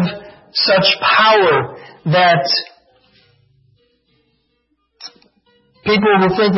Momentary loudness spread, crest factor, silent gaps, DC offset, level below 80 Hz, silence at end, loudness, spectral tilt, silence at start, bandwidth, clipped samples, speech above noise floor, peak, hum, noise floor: 24 LU; 16 dB; none; under 0.1%; -56 dBFS; 0 s; -13 LUFS; -6.5 dB/octave; 0 s; 6 kHz; under 0.1%; 52 dB; -2 dBFS; none; -65 dBFS